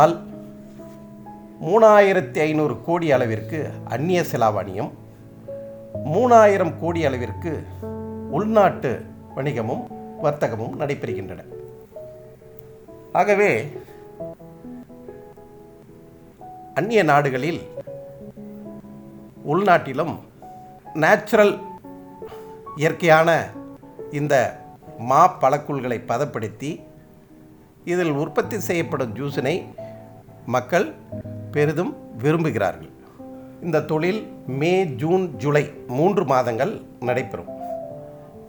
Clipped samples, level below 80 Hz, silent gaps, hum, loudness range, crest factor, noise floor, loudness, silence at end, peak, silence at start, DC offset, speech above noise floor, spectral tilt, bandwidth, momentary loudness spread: under 0.1%; -60 dBFS; none; none; 6 LU; 20 dB; -48 dBFS; -21 LUFS; 0 s; -2 dBFS; 0 s; under 0.1%; 28 dB; -6.5 dB/octave; over 20 kHz; 24 LU